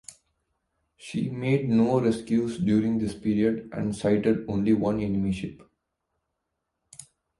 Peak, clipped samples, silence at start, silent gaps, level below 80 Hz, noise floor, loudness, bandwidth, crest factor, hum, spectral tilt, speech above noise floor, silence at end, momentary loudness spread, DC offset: -10 dBFS; under 0.1%; 1 s; none; -54 dBFS; -81 dBFS; -26 LUFS; 11.5 kHz; 16 dB; none; -7.5 dB/octave; 56 dB; 0.35 s; 9 LU; under 0.1%